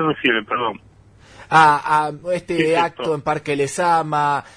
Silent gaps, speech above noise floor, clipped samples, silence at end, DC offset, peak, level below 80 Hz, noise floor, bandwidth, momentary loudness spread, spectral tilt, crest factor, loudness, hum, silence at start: none; 28 dB; under 0.1%; 0.15 s; under 0.1%; -2 dBFS; -56 dBFS; -47 dBFS; 10.5 kHz; 10 LU; -4.5 dB/octave; 18 dB; -18 LUFS; none; 0 s